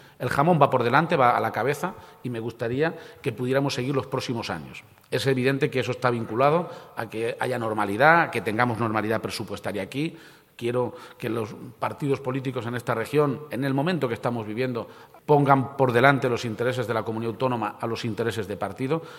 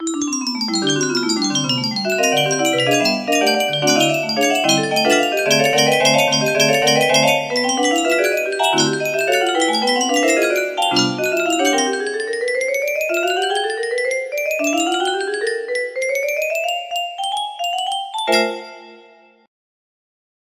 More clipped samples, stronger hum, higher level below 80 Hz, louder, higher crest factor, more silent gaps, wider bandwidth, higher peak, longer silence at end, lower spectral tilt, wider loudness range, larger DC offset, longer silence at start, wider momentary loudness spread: neither; neither; about the same, -64 dBFS vs -64 dBFS; second, -25 LUFS vs -17 LUFS; first, 24 dB vs 18 dB; neither; about the same, 16.5 kHz vs 15.5 kHz; about the same, -2 dBFS vs 0 dBFS; second, 0 s vs 1.45 s; first, -6.5 dB/octave vs -2.5 dB/octave; about the same, 5 LU vs 6 LU; neither; first, 0.2 s vs 0 s; first, 13 LU vs 8 LU